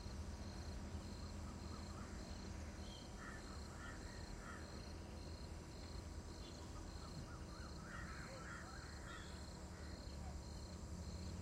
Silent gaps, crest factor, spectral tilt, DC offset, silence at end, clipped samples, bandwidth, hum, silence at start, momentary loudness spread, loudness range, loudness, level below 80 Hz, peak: none; 14 dB; -5 dB/octave; under 0.1%; 0 s; under 0.1%; 16 kHz; none; 0 s; 2 LU; 1 LU; -53 LUFS; -56 dBFS; -38 dBFS